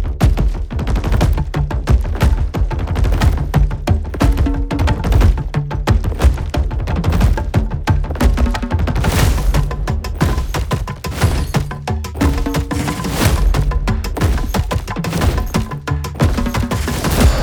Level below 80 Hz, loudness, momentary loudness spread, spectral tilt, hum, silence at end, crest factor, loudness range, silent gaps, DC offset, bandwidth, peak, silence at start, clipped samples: -18 dBFS; -18 LUFS; 6 LU; -6 dB/octave; none; 0 s; 14 dB; 2 LU; none; under 0.1%; over 20 kHz; -2 dBFS; 0 s; under 0.1%